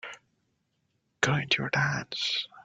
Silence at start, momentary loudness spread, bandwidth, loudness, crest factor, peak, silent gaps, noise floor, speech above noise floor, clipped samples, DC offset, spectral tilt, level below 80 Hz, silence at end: 0.05 s; 5 LU; 9.4 kHz; -28 LUFS; 26 dB; -6 dBFS; none; -76 dBFS; 47 dB; under 0.1%; under 0.1%; -3.5 dB/octave; -66 dBFS; 0.05 s